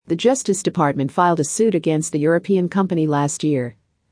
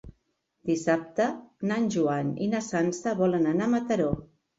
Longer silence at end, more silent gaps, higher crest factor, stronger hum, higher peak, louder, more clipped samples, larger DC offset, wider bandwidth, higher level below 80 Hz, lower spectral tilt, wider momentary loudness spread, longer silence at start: about the same, 0.4 s vs 0.35 s; neither; about the same, 16 dB vs 16 dB; neither; first, -2 dBFS vs -10 dBFS; first, -19 LUFS vs -27 LUFS; neither; neither; first, 10.5 kHz vs 8 kHz; second, -64 dBFS vs -56 dBFS; about the same, -5.5 dB/octave vs -6.5 dB/octave; second, 3 LU vs 6 LU; about the same, 0.1 s vs 0.05 s